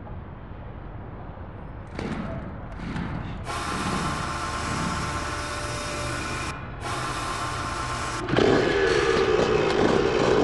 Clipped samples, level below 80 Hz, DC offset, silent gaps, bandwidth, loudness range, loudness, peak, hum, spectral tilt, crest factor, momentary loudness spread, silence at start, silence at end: under 0.1%; -40 dBFS; 0.3%; none; 12.5 kHz; 11 LU; -26 LUFS; -6 dBFS; none; -5 dB/octave; 20 dB; 18 LU; 0 s; 0 s